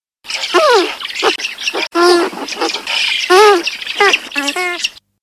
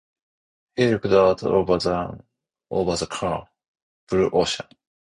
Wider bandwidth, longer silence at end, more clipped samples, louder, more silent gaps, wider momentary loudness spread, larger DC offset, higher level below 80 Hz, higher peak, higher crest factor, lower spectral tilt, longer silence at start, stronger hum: first, 16 kHz vs 11 kHz; second, 0.3 s vs 0.45 s; neither; first, -13 LUFS vs -22 LUFS; second, none vs 3.68-3.74 s, 3.82-4.07 s; second, 10 LU vs 13 LU; neither; second, -60 dBFS vs -48 dBFS; first, 0 dBFS vs -4 dBFS; second, 14 dB vs 20 dB; second, -0.5 dB/octave vs -5.5 dB/octave; second, 0.25 s vs 0.75 s; neither